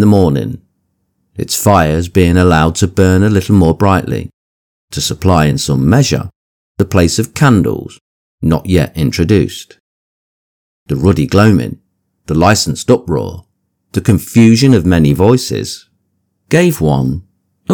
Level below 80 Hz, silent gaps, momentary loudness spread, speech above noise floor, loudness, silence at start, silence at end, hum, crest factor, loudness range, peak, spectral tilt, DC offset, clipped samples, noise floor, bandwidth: -32 dBFS; 4.33-4.88 s, 6.36-6.75 s, 8.01-8.38 s, 9.80-10.86 s; 15 LU; 54 dB; -11 LUFS; 0 s; 0 s; none; 12 dB; 4 LU; 0 dBFS; -6 dB/octave; under 0.1%; 0.6%; -64 dBFS; 19.5 kHz